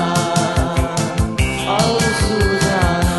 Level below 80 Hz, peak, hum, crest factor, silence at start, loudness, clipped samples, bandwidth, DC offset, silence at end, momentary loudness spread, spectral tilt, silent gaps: -26 dBFS; -2 dBFS; none; 14 dB; 0 s; -17 LUFS; under 0.1%; 12.5 kHz; 0.2%; 0 s; 3 LU; -4.5 dB/octave; none